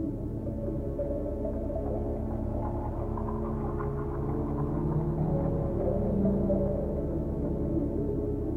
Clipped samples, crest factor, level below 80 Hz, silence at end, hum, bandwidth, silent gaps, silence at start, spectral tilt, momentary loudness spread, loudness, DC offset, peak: under 0.1%; 16 dB; -36 dBFS; 0 s; none; 3.2 kHz; none; 0 s; -11.5 dB/octave; 6 LU; -31 LUFS; under 0.1%; -14 dBFS